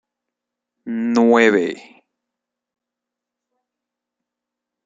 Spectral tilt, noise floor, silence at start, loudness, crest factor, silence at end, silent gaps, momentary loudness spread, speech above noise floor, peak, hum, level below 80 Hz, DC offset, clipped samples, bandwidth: -5 dB/octave; -84 dBFS; 0.85 s; -16 LUFS; 20 dB; 3.05 s; none; 15 LU; 68 dB; -2 dBFS; none; -72 dBFS; under 0.1%; under 0.1%; 7.8 kHz